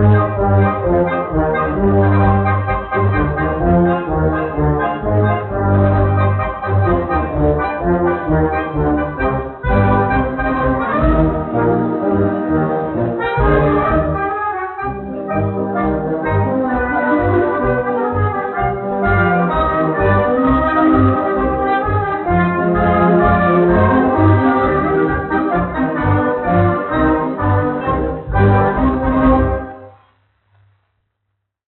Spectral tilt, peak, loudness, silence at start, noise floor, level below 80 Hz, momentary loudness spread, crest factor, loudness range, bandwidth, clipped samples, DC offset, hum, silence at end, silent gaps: -7.5 dB/octave; 0 dBFS; -15 LUFS; 0 s; -73 dBFS; -28 dBFS; 6 LU; 14 dB; 4 LU; 4.2 kHz; under 0.1%; under 0.1%; none; 1.8 s; none